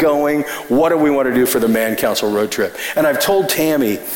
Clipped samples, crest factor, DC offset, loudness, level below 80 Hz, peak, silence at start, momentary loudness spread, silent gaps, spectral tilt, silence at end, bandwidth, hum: under 0.1%; 10 dB; 0.3%; -16 LUFS; -50 dBFS; -6 dBFS; 0 s; 4 LU; none; -4 dB/octave; 0 s; 17 kHz; none